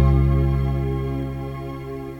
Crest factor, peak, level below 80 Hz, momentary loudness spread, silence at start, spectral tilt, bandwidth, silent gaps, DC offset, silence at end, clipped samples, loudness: 14 dB; -8 dBFS; -26 dBFS; 13 LU; 0 s; -9.5 dB/octave; 5.8 kHz; none; under 0.1%; 0 s; under 0.1%; -23 LUFS